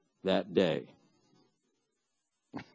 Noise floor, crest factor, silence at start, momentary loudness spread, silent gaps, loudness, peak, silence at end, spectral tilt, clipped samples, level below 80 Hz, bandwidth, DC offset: -83 dBFS; 24 dB; 0.25 s; 19 LU; none; -31 LUFS; -12 dBFS; 0.1 s; -7 dB/octave; under 0.1%; -70 dBFS; 8 kHz; under 0.1%